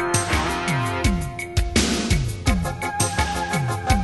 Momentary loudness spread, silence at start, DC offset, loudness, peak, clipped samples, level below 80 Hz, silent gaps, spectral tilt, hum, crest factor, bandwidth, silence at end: 4 LU; 0 s; under 0.1%; -22 LUFS; -4 dBFS; under 0.1%; -28 dBFS; none; -4 dB/octave; none; 18 dB; 12.5 kHz; 0 s